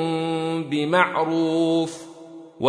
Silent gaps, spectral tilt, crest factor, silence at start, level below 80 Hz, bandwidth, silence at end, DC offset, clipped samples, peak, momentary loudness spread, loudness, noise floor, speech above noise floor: none; -6 dB/octave; 20 dB; 0 s; -70 dBFS; 10.5 kHz; 0 s; under 0.1%; under 0.1%; -2 dBFS; 21 LU; -22 LUFS; -42 dBFS; 21 dB